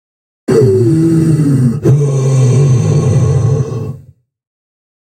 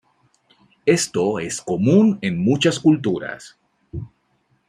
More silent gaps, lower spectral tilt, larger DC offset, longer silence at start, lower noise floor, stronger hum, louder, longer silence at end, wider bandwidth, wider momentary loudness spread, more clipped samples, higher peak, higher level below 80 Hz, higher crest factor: neither; first, -8.5 dB/octave vs -5.5 dB/octave; neither; second, 0.5 s vs 0.85 s; second, -41 dBFS vs -65 dBFS; neither; first, -11 LUFS vs -19 LUFS; first, 1.05 s vs 0.6 s; second, 10 kHz vs 14.5 kHz; second, 7 LU vs 19 LU; neither; first, 0 dBFS vs -4 dBFS; first, -42 dBFS vs -54 dBFS; second, 10 dB vs 16 dB